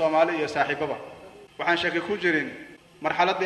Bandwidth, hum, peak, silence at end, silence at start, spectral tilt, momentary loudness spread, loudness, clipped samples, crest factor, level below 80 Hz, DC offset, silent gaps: 12 kHz; none; -8 dBFS; 0 s; 0 s; -5 dB/octave; 20 LU; -25 LUFS; under 0.1%; 18 dB; -64 dBFS; under 0.1%; none